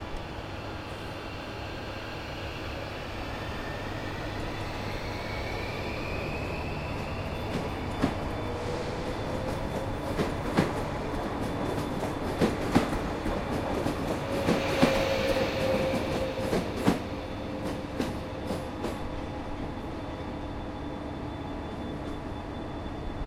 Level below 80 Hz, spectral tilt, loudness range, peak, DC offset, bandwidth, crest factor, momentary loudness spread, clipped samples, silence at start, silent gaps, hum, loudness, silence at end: -42 dBFS; -6 dB/octave; 9 LU; -6 dBFS; under 0.1%; 16.5 kHz; 24 dB; 10 LU; under 0.1%; 0 s; none; none; -32 LUFS; 0 s